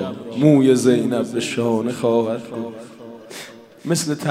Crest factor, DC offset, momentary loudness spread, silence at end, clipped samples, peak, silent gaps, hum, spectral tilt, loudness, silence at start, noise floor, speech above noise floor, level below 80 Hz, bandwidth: 18 dB; under 0.1%; 22 LU; 0 s; under 0.1%; 0 dBFS; none; none; -6 dB/octave; -18 LUFS; 0 s; -38 dBFS; 20 dB; -66 dBFS; 16 kHz